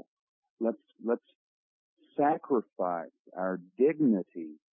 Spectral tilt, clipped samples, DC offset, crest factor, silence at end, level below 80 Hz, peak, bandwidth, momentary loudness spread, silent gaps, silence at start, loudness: -11.5 dB/octave; under 0.1%; under 0.1%; 18 dB; 0.2 s; -82 dBFS; -14 dBFS; 3.7 kHz; 13 LU; 1.35-1.97 s, 3.19-3.25 s; 0.6 s; -31 LUFS